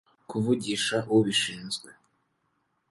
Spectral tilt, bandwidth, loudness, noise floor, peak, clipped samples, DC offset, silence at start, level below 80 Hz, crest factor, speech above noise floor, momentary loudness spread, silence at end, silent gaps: -4 dB/octave; 11.5 kHz; -27 LUFS; -75 dBFS; -10 dBFS; under 0.1%; under 0.1%; 0.3 s; -66 dBFS; 20 dB; 48 dB; 12 LU; 1 s; none